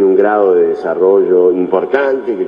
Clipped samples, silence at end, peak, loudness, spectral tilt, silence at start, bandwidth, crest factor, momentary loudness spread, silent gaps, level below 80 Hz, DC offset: under 0.1%; 0 s; 0 dBFS; -12 LUFS; -8.5 dB/octave; 0 s; 5.2 kHz; 12 dB; 5 LU; none; -58 dBFS; under 0.1%